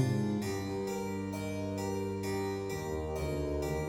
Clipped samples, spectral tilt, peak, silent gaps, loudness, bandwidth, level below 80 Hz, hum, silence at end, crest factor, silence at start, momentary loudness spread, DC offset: under 0.1%; -6.5 dB/octave; -16 dBFS; none; -36 LUFS; 17.5 kHz; -48 dBFS; none; 0 s; 18 dB; 0 s; 3 LU; under 0.1%